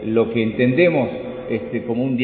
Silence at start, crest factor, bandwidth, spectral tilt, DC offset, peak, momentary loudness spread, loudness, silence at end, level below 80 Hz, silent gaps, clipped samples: 0 s; 16 dB; 4.4 kHz; -12 dB/octave; under 0.1%; -2 dBFS; 10 LU; -20 LUFS; 0 s; -50 dBFS; none; under 0.1%